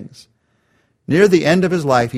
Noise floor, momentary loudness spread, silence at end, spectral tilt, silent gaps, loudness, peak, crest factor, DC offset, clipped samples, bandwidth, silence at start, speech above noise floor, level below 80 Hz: -62 dBFS; 4 LU; 0 s; -6 dB/octave; none; -14 LUFS; 0 dBFS; 16 dB; under 0.1%; under 0.1%; 15 kHz; 0 s; 48 dB; -52 dBFS